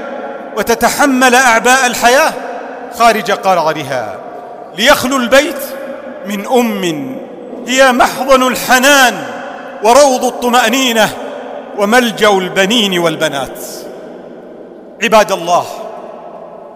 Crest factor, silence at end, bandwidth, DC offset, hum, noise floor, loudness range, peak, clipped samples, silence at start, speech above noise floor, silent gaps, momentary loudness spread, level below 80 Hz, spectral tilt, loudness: 12 dB; 0 s; 16 kHz; under 0.1%; none; -32 dBFS; 4 LU; 0 dBFS; under 0.1%; 0 s; 22 dB; none; 19 LU; -44 dBFS; -2.5 dB/octave; -10 LUFS